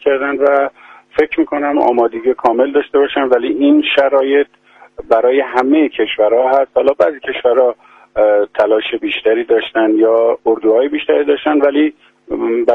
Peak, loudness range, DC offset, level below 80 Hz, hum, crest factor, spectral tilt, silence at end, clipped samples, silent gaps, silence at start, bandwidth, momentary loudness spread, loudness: 0 dBFS; 1 LU; under 0.1%; -54 dBFS; none; 14 dB; -6 dB/octave; 0 s; under 0.1%; none; 0.05 s; 5.4 kHz; 5 LU; -13 LUFS